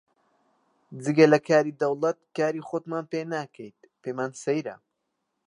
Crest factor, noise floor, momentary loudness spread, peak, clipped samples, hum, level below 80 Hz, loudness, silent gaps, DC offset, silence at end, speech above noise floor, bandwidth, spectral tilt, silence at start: 22 dB; -79 dBFS; 21 LU; -4 dBFS; under 0.1%; none; -80 dBFS; -25 LUFS; none; under 0.1%; 0.75 s; 54 dB; 10.5 kHz; -6 dB/octave; 0.9 s